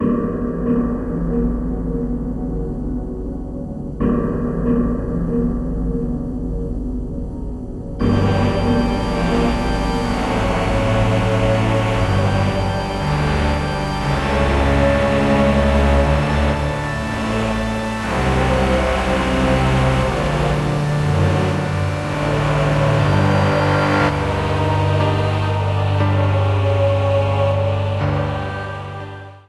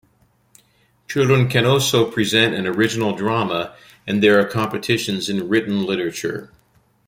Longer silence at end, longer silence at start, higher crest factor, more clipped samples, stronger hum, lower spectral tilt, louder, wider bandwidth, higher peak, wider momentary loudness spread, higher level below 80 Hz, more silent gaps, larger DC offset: second, 0.1 s vs 0.6 s; second, 0 s vs 1.1 s; about the same, 16 dB vs 18 dB; neither; neither; first, -7 dB/octave vs -5 dB/octave; about the same, -19 LUFS vs -19 LUFS; second, 12 kHz vs 16.5 kHz; about the same, -2 dBFS vs -2 dBFS; about the same, 9 LU vs 10 LU; first, -26 dBFS vs -56 dBFS; neither; neither